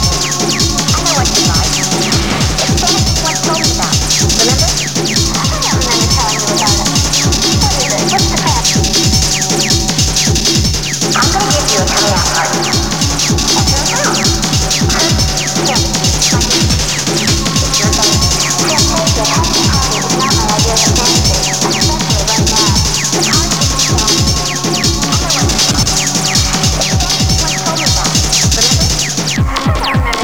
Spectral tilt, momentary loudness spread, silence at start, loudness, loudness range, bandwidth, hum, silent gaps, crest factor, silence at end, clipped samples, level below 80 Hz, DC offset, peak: -3 dB/octave; 3 LU; 0 s; -10 LUFS; 1 LU; over 20 kHz; none; none; 12 dB; 0 s; under 0.1%; -22 dBFS; 2%; 0 dBFS